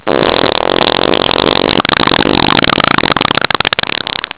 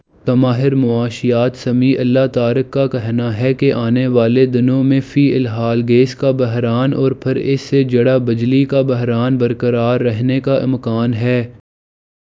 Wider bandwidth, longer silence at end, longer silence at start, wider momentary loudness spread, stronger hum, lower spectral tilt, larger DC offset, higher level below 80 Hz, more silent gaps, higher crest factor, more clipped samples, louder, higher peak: second, 4 kHz vs 7.6 kHz; second, 0.1 s vs 0.65 s; second, 0.05 s vs 0.25 s; about the same, 2 LU vs 4 LU; neither; about the same, -8.5 dB/octave vs -8.5 dB/octave; neither; first, -34 dBFS vs -50 dBFS; neither; about the same, 12 dB vs 14 dB; first, 2% vs under 0.1%; first, -10 LUFS vs -15 LUFS; about the same, 0 dBFS vs 0 dBFS